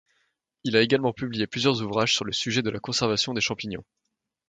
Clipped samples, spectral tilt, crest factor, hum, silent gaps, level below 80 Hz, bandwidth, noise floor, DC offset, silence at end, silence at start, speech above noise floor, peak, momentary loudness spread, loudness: under 0.1%; -4 dB/octave; 22 dB; none; none; -60 dBFS; 9.4 kHz; -73 dBFS; under 0.1%; 0.65 s; 0.65 s; 48 dB; -4 dBFS; 9 LU; -25 LUFS